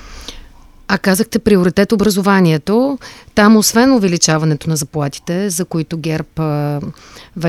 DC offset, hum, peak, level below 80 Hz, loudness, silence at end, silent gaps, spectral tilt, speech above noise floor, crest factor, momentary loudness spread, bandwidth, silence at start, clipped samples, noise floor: under 0.1%; none; 0 dBFS; -42 dBFS; -14 LUFS; 0 s; none; -5 dB/octave; 25 dB; 14 dB; 12 LU; 15 kHz; 0 s; under 0.1%; -39 dBFS